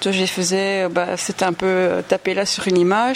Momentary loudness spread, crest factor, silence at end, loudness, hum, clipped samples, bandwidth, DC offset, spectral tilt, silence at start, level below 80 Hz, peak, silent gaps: 4 LU; 16 dB; 0 s; -19 LUFS; none; under 0.1%; 16 kHz; under 0.1%; -4 dB/octave; 0 s; -58 dBFS; -2 dBFS; none